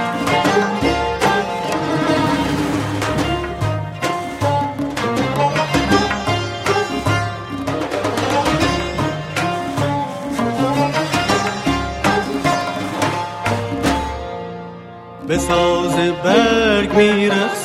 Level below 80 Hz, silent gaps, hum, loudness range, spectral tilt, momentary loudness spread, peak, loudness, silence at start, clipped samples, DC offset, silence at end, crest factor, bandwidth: -36 dBFS; none; none; 2 LU; -5 dB/octave; 8 LU; -2 dBFS; -18 LUFS; 0 s; under 0.1%; under 0.1%; 0 s; 16 dB; 16 kHz